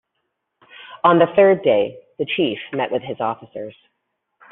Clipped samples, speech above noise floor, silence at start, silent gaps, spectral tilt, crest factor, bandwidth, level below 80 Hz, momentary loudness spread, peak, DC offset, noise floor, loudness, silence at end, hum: under 0.1%; 57 dB; 0.8 s; none; -4 dB/octave; 18 dB; 4 kHz; -64 dBFS; 20 LU; -2 dBFS; under 0.1%; -75 dBFS; -18 LUFS; 0.8 s; none